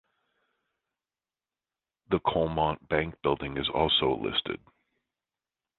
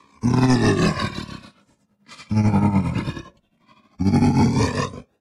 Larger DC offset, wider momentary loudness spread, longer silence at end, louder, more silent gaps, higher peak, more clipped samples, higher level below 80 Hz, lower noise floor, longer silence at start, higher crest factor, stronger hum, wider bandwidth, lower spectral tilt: neither; second, 7 LU vs 15 LU; first, 1.2 s vs 0.2 s; second, -28 LUFS vs -20 LUFS; neither; about the same, -10 dBFS vs -8 dBFS; neither; second, -52 dBFS vs -42 dBFS; first, under -90 dBFS vs -61 dBFS; first, 2.1 s vs 0.25 s; first, 22 dB vs 12 dB; neither; second, 4.4 kHz vs 12 kHz; first, -8.5 dB/octave vs -6.5 dB/octave